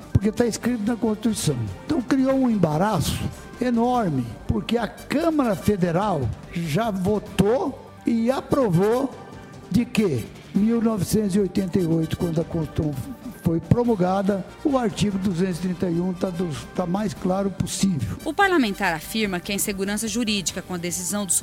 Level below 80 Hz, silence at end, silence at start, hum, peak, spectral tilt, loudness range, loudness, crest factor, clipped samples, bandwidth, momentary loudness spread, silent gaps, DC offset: -44 dBFS; 0 s; 0 s; none; -2 dBFS; -5.5 dB/octave; 1 LU; -23 LUFS; 22 dB; under 0.1%; 17 kHz; 7 LU; none; under 0.1%